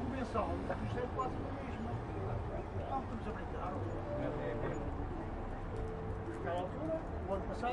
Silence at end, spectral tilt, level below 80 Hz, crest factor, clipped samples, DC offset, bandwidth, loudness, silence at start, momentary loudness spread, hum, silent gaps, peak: 0 s; -8 dB/octave; -48 dBFS; 16 dB; under 0.1%; under 0.1%; 11 kHz; -40 LUFS; 0 s; 4 LU; none; none; -22 dBFS